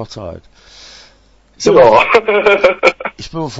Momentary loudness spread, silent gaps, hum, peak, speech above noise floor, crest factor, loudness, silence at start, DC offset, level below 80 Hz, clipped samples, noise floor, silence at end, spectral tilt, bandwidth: 19 LU; none; none; 0 dBFS; 37 dB; 14 dB; -10 LUFS; 0 s; under 0.1%; -44 dBFS; under 0.1%; -49 dBFS; 0 s; -4.5 dB/octave; 8 kHz